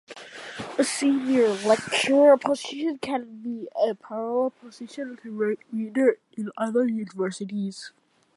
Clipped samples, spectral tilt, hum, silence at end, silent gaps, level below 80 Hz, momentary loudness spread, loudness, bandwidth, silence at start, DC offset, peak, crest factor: under 0.1%; -4 dB/octave; none; 0.45 s; none; -72 dBFS; 15 LU; -25 LUFS; 11.5 kHz; 0.1 s; under 0.1%; -6 dBFS; 20 dB